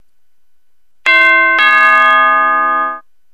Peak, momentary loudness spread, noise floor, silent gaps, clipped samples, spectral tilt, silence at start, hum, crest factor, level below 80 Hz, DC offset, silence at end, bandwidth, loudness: 0 dBFS; 10 LU; -64 dBFS; none; under 0.1%; -1.5 dB/octave; 1.05 s; none; 12 dB; -62 dBFS; 0.8%; 0.35 s; 13 kHz; -9 LUFS